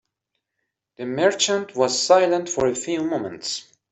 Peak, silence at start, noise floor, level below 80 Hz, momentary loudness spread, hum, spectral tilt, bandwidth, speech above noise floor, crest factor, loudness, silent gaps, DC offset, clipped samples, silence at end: -4 dBFS; 1 s; -79 dBFS; -60 dBFS; 12 LU; none; -3 dB/octave; 8.4 kHz; 58 dB; 18 dB; -21 LUFS; none; under 0.1%; under 0.1%; 0.3 s